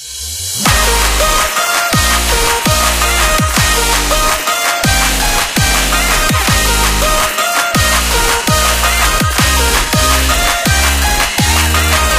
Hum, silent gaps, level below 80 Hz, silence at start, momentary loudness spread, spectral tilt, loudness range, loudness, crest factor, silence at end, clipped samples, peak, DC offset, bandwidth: none; none; -18 dBFS; 0 s; 2 LU; -2.5 dB/octave; 0 LU; -11 LUFS; 12 dB; 0 s; under 0.1%; 0 dBFS; under 0.1%; 16 kHz